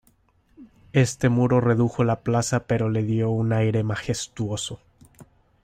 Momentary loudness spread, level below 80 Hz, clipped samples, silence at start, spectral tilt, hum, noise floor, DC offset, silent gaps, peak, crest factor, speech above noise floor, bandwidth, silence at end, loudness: 9 LU; -52 dBFS; under 0.1%; 0.6 s; -6 dB/octave; none; -62 dBFS; under 0.1%; none; -6 dBFS; 18 dB; 40 dB; 12.5 kHz; 0.4 s; -23 LUFS